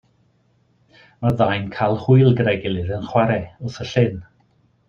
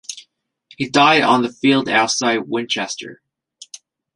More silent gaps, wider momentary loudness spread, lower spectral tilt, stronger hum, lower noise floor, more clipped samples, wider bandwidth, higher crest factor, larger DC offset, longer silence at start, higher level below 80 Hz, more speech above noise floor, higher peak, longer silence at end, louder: neither; second, 11 LU vs 24 LU; first, -8 dB/octave vs -3 dB/octave; neither; first, -61 dBFS vs -57 dBFS; neither; second, 6.8 kHz vs 11.5 kHz; about the same, 18 dB vs 18 dB; neither; first, 1.2 s vs 0.1 s; first, -50 dBFS vs -64 dBFS; about the same, 43 dB vs 41 dB; about the same, -2 dBFS vs -2 dBFS; second, 0.65 s vs 1 s; second, -19 LUFS vs -16 LUFS